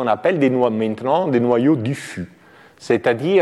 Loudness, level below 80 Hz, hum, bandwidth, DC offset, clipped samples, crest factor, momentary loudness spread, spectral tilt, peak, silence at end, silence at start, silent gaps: -18 LUFS; -62 dBFS; none; 12.5 kHz; under 0.1%; under 0.1%; 14 dB; 12 LU; -7 dB/octave; -4 dBFS; 0 s; 0 s; none